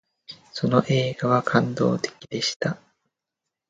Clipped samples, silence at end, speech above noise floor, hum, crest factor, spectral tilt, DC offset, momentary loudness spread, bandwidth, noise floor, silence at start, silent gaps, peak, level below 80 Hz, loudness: under 0.1%; 0.95 s; 62 dB; none; 24 dB; -5.5 dB/octave; under 0.1%; 16 LU; 9.2 kHz; -85 dBFS; 0.3 s; 2.56-2.60 s; -2 dBFS; -62 dBFS; -23 LUFS